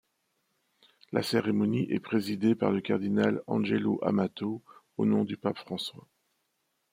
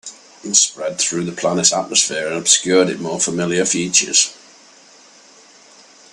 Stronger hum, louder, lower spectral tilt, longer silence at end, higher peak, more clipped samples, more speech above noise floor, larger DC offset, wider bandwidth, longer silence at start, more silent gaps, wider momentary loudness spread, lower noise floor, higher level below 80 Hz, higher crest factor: neither; second, -29 LUFS vs -16 LUFS; first, -7 dB/octave vs -2 dB/octave; second, 0.95 s vs 1.8 s; second, -10 dBFS vs 0 dBFS; neither; first, 49 dB vs 29 dB; neither; first, 16 kHz vs 14.5 kHz; first, 1.1 s vs 0.05 s; neither; about the same, 9 LU vs 7 LU; first, -78 dBFS vs -46 dBFS; second, -72 dBFS vs -62 dBFS; about the same, 20 dB vs 20 dB